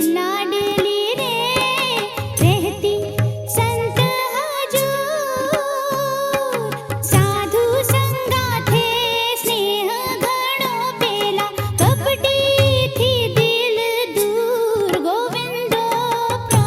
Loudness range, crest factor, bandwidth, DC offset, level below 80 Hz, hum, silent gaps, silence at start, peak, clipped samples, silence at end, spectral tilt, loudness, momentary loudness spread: 3 LU; 16 dB; 16.5 kHz; under 0.1%; -50 dBFS; none; none; 0 s; -2 dBFS; under 0.1%; 0 s; -4 dB/octave; -18 LUFS; 5 LU